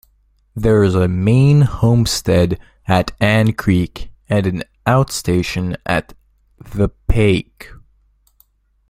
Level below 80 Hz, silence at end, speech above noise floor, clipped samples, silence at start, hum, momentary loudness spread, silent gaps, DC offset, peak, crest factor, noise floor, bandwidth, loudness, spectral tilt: -32 dBFS; 1.15 s; 42 dB; under 0.1%; 0.55 s; none; 9 LU; none; under 0.1%; 0 dBFS; 16 dB; -57 dBFS; 16 kHz; -16 LUFS; -6.5 dB/octave